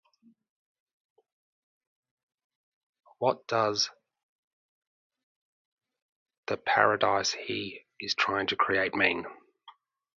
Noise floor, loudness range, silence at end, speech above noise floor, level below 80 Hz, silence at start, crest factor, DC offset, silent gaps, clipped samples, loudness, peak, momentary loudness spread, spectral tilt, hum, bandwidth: -58 dBFS; 8 LU; 0.45 s; 30 dB; -70 dBFS; 3.2 s; 26 dB; under 0.1%; 4.23-5.10 s, 5.23-5.77 s, 6.02-6.26 s, 6.38-6.43 s; under 0.1%; -28 LUFS; -6 dBFS; 12 LU; -3 dB/octave; none; 7.6 kHz